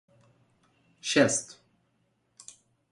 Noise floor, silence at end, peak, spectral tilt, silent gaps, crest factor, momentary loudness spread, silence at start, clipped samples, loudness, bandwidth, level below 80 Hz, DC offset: -73 dBFS; 1.45 s; -8 dBFS; -3 dB/octave; none; 24 dB; 26 LU; 1.05 s; under 0.1%; -26 LUFS; 11.5 kHz; -76 dBFS; under 0.1%